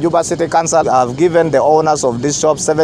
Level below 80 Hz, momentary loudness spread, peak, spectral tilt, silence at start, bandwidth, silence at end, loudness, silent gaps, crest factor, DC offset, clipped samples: -46 dBFS; 4 LU; 0 dBFS; -4.5 dB/octave; 0 s; 14.5 kHz; 0 s; -13 LUFS; none; 12 dB; under 0.1%; under 0.1%